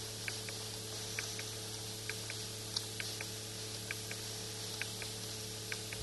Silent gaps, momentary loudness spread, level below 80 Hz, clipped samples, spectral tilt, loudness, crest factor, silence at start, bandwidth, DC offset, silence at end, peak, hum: none; 3 LU; -64 dBFS; under 0.1%; -2 dB/octave; -41 LUFS; 22 dB; 0 s; 12 kHz; under 0.1%; 0 s; -20 dBFS; none